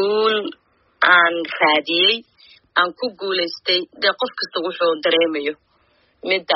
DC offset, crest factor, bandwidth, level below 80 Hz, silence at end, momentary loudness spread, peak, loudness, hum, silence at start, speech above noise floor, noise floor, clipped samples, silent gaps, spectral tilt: under 0.1%; 18 dB; 6 kHz; -70 dBFS; 0 s; 11 LU; -2 dBFS; -18 LUFS; none; 0 s; 41 dB; -60 dBFS; under 0.1%; none; 1 dB/octave